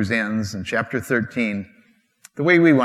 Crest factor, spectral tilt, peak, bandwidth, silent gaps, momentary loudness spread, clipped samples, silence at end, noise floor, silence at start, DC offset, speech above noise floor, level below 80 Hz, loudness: 20 dB; -6.5 dB/octave; -2 dBFS; 13.5 kHz; none; 15 LU; under 0.1%; 0 s; -58 dBFS; 0 s; under 0.1%; 38 dB; -62 dBFS; -21 LUFS